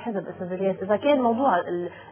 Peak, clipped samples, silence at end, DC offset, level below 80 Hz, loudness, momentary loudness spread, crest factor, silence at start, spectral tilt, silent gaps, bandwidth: -10 dBFS; under 0.1%; 0 s; under 0.1%; -64 dBFS; -24 LUFS; 11 LU; 14 dB; 0 s; -10 dB/octave; none; 3.5 kHz